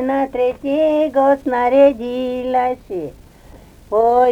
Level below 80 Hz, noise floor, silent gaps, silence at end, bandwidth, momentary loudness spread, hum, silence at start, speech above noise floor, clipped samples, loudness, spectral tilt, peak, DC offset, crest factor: -46 dBFS; -42 dBFS; none; 0 s; 8.8 kHz; 12 LU; none; 0 s; 27 dB; under 0.1%; -16 LUFS; -6.5 dB/octave; -2 dBFS; under 0.1%; 14 dB